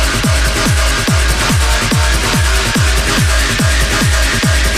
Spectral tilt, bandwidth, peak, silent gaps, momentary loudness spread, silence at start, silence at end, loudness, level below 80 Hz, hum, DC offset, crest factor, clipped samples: -3.5 dB/octave; 15.5 kHz; 0 dBFS; none; 1 LU; 0 s; 0 s; -12 LUFS; -16 dBFS; none; under 0.1%; 12 dB; under 0.1%